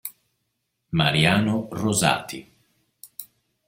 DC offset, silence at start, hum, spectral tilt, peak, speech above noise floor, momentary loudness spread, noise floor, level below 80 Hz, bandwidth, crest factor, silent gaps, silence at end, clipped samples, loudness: under 0.1%; 0.05 s; none; -4 dB/octave; -2 dBFS; 55 dB; 21 LU; -76 dBFS; -56 dBFS; 16.5 kHz; 22 dB; none; 0.45 s; under 0.1%; -21 LUFS